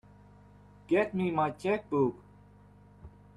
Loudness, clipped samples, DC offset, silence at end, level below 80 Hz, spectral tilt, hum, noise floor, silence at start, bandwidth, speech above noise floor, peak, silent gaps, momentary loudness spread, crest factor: -30 LUFS; under 0.1%; under 0.1%; 0.3 s; -62 dBFS; -8 dB/octave; 50 Hz at -55 dBFS; -56 dBFS; 0.9 s; 11.5 kHz; 27 dB; -14 dBFS; none; 4 LU; 18 dB